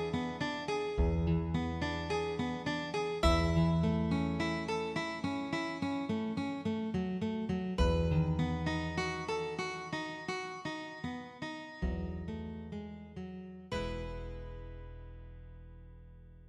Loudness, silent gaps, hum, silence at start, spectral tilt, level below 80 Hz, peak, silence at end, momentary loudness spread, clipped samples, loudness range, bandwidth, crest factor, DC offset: -35 LUFS; none; none; 0 s; -6.5 dB/octave; -44 dBFS; -16 dBFS; 0 s; 16 LU; under 0.1%; 10 LU; 10.5 kHz; 20 dB; under 0.1%